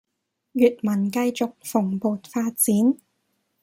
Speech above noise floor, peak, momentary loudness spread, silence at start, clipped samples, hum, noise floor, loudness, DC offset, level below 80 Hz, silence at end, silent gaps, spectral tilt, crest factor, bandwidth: 57 dB; -6 dBFS; 8 LU; 0.55 s; under 0.1%; none; -79 dBFS; -23 LUFS; under 0.1%; -68 dBFS; 0.7 s; none; -5.5 dB/octave; 18 dB; 16.5 kHz